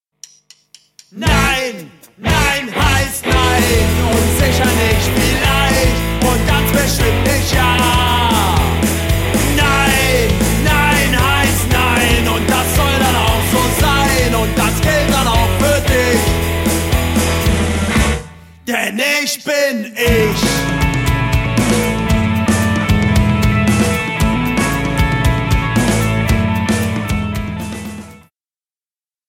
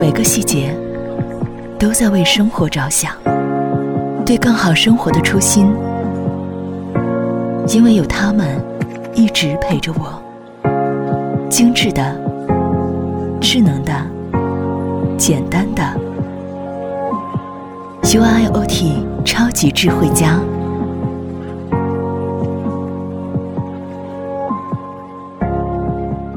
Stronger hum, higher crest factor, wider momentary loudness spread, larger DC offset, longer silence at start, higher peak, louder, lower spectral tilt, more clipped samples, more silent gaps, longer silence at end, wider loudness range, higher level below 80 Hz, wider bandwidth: neither; about the same, 14 dB vs 16 dB; second, 4 LU vs 13 LU; neither; first, 1.15 s vs 0 s; about the same, 0 dBFS vs 0 dBFS; about the same, -14 LUFS vs -16 LUFS; about the same, -4.5 dB/octave vs -4.5 dB/octave; neither; neither; first, 1.15 s vs 0 s; second, 3 LU vs 7 LU; first, -22 dBFS vs -36 dBFS; second, 17 kHz vs over 20 kHz